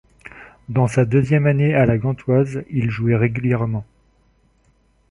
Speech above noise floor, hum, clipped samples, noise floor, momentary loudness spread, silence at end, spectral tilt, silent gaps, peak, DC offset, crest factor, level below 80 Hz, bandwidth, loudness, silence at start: 42 dB; none; under 0.1%; -59 dBFS; 11 LU; 1.3 s; -9 dB/octave; none; -4 dBFS; under 0.1%; 16 dB; -46 dBFS; 11 kHz; -19 LUFS; 0.25 s